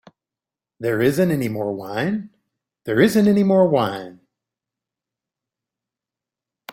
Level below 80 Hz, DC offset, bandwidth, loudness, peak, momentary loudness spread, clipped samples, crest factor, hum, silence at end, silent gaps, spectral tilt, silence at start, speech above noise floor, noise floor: -60 dBFS; under 0.1%; 16.5 kHz; -19 LUFS; -2 dBFS; 13 LU; under 0.1%; 20 dB; none; 2.6 s; none; -6.5 dB/octave; 0.8 s; 70 dB; -89 dBFS